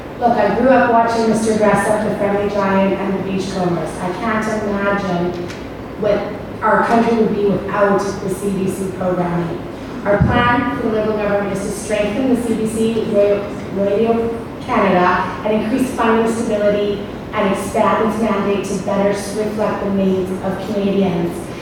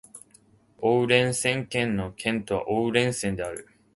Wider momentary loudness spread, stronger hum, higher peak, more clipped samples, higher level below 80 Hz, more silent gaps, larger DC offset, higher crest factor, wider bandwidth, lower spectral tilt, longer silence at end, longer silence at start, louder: about the same, 8 LU vs 9 LU; neither; first, 0 dBFS vs -6 dBFS; neither; first, -40 dBFS vs -54 dBFS; neither; neither; about the same, 16 dB vs 20 dB; first, 18 kHz vs 12 kHz; first, -6 dB/octave vs -4.5 dB/octave; second, 0 s vs 0.3 s; second, 0 s vs 0.15 s; first, -17 LUFS vs -25 LUFS